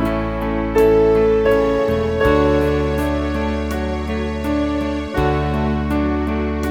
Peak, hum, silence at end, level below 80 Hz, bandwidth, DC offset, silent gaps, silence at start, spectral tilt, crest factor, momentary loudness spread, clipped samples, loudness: -2 dBFS; none; 0 s; -28 dBFS; 18 kHz; 0.2%; none; 0 s; -7.5 dB/octave; 16 dB; 8 LU; under 0.1%; -18 LUFS